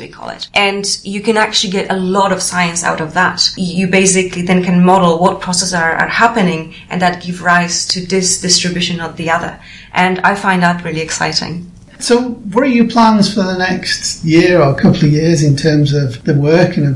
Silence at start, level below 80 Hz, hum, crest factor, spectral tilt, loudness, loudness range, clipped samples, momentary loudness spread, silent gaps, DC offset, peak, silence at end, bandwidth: 0 s; -42 dBFS; none; 12 dB; -4.5 dB/octave; -12 LUFS; 3 LU; under 0.1%; 7 LU; none; under 0.1%; 0 dBFS; 0 s; 11.5 kHz